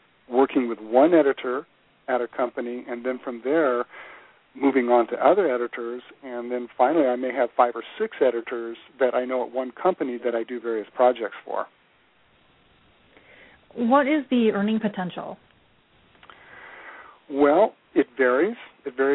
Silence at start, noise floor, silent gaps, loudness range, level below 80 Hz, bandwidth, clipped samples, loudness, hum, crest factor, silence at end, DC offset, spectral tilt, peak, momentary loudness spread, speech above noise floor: 0.3 s; -61 dBFS; none; 5 LU; -70 dBFS; 4.1 kHz; under 0.1%; -23 LUFS; none; 20 dB; 0 s; under 0.1%; -10 dB/octave; -4 dBFS; 17 LU; 38 dB